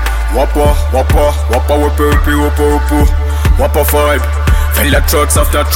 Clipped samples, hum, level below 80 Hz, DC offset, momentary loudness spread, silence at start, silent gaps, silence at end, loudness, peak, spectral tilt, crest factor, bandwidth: under 0.1%; none; -12 dBFS; 0.6%; 3 LU; 0 s; none; 0 s; -11 LUFS; 0 dBFS; -5 dB/octave; 10 dB; 17 kHz